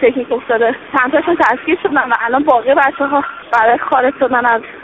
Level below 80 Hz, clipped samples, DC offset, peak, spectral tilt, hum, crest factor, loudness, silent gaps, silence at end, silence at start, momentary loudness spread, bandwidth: -52 dBFS; under 0.1%; under 0.1%; 0 dBFS; -2 dB/octave; none; 14 dB; -13 LUFS; none; 0 s; 0 s; 4 LU; 7.6 kHz